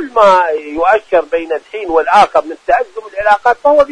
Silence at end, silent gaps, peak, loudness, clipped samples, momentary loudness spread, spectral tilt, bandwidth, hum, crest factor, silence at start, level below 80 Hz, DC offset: 0 s; none; 0 dBFS; -12 LUFS; 0.3%; 9 LU; -4 dB/octave; 10.5 kHz; none; 12 dB; 0 s; -44 dBFS; under 0.1%